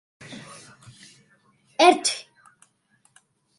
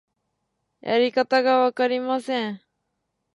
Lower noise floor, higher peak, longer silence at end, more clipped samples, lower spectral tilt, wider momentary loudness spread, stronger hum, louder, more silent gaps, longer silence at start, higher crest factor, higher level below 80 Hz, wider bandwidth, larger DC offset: second, -65 dBFS vs -77 dBFS; first, -2 dBFS vs -8 dBFS; first, 1.4 s vs 0.75 s; neither; second, -2 dB/octave vs -5 dB/octave; first, 26 LU vs 13 LU; neither; about the same, -20 LUFS vs -22 LUFS; neither; second, 0.3 s vs 0.85 s; first, 24 dB vs 16 dB; about the same, -76 dBFS vs -78 dBFS; about the same, 11.5 kHz vs 11.5 kHz; neither